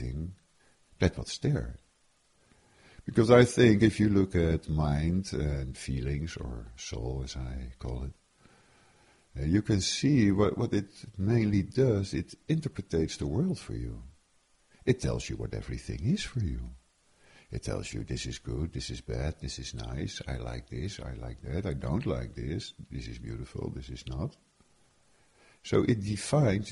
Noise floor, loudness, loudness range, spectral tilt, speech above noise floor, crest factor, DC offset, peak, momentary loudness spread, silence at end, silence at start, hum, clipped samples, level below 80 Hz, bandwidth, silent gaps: -68 dBFS; -31 LUFS; 11 LU; -6.5 dB/octave; 38 dB; 24 dB; under 0.1%; -8 dBFS; 16 LU; 0 s; 0 s; none; under 0.1%; -44 dBFS; 11.5 kHz; none